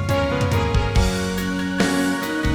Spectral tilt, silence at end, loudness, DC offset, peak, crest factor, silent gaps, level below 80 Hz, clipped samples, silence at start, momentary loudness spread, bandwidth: -5.5 dB/octave; 0 s; -21 LUFS; under 0.1%; -8 dBFS; 12 dB; none; -28 dBFS; under 0.1%; 0 s; 4 LU; 19.5 kHz